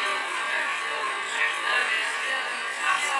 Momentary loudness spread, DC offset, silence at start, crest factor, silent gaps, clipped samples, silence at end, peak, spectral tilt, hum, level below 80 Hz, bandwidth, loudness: 4 LU; under 0.1%; 0 s; 16 dB; none; under 0.1%; 0 s; -12 dBFS; 1.5 dB/octave; none; -78 dBFS; 11.5 kHz; -25 LUFS